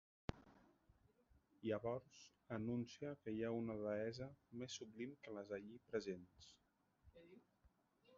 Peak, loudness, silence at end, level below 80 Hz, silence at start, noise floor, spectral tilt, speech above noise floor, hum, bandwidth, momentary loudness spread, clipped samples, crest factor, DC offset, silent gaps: -26 dBFS; -49 LUFS; 0 s; -74 dBFS; 0.3 s; -78 dBFS; -5.5 dB/octave; 30 dB; none; 7.4 kHz; 21 LU; under 0.1%; 24 dB; under 0.1%; none